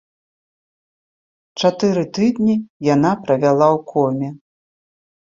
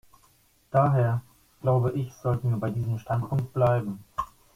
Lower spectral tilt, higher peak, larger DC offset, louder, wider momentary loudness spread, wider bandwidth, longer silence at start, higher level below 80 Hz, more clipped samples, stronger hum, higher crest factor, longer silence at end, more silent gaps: second, -6.5 dB/octave vs -9 dB/octave; first, -2 dBFS vs -8 dBFS; neither; first, -17 LUFS vs -27 LUFS; second, 6 LU vs 10 LU; second, 7.6 kHz vs 14.5 kHz; first, 1.55 s vs 0.75 s; second, -60 dBFS vs -54 dBFS; neither; neither; about the same, 18 dB vs 18 dB; first, 1 s vs 0.3 s; first, 2.70-2.80 s vs none